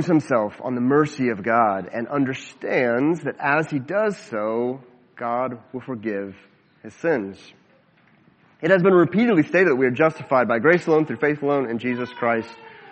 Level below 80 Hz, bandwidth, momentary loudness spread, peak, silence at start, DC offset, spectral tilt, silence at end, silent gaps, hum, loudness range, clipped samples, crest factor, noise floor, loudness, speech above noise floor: -68 dBFS; 8.4 kHz; 11 LU; -2 dBFS; 0 s; under 0.1%; -7.5 dB/octave; 0 s; none; none; 10 LU; under 0.1%; 20 dB; -57 dBFS; -21 LUFS; 36 dB